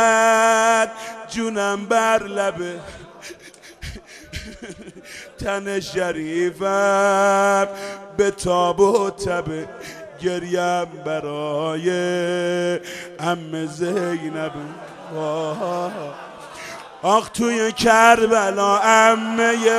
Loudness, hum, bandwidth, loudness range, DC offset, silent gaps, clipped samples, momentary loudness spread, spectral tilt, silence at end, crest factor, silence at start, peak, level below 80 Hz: -19 LUFS; none; 14 kHz; 9 LU; under 0.1%; none; under 0.1%; 21 LU; -3.5 dB/octave; 0 s; 20 dB; 0 s; 0 dBFS; -50 dBFS